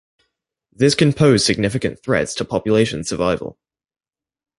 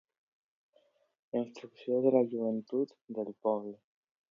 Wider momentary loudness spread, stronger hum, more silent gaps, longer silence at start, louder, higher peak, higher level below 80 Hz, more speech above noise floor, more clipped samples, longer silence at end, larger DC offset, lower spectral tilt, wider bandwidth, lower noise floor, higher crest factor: second, 8 LU vs 13 LU; neither; second, none vs 3.01-3.05 s; second, 0.8 s vs 1.35 s; first, -18 LUFS vs -33 LUFS; first, -2 dBFS vs -14 dBFS; first, -46 dBFS vs -86 dBFS; first, 57 dB vs 38 dB; neither; first, 1.05 s vs 0.55 s; neither; second, -5 dB/octave vs -8.5 dB/octave; first, 11.5 kHz vs 7.2 kHz; about the same, -74 dBFS vs -71 dBFS; about the same, 18 dB vs 22 dB